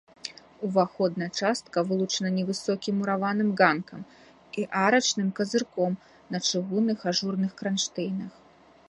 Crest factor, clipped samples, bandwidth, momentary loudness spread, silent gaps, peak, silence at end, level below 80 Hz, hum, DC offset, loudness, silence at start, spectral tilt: 22 dB; under 0.1%; 11 kHz; 14 LU; none; -4 dBFS; 0.6 s; -70 dBFS; none; under 0.1%; -27 LUFS; 0.25 s; -4.5 dB/octave